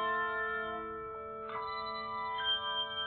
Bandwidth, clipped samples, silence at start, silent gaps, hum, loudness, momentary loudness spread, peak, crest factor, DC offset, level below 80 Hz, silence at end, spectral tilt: 4.5 kHz; under 0.1%; 0 s; none; none; -36 LUFS; 10 LU; -22 dBFS; 14 dB; under 0.1%; -64 dBFS; 0 s; 1.5 dB/octave